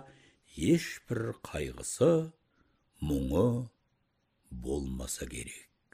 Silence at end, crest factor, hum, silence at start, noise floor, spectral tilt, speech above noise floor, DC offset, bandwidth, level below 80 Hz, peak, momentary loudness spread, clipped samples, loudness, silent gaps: 0.3 s; 18 dB; none; 0 s; -76 dBFS; -6 dB/octave; 45 dB; under 0.1%; 15.5 kHz; -48 dBFS; -14 dBFS; 17 LU; under 0.1%; -32 LUFS; none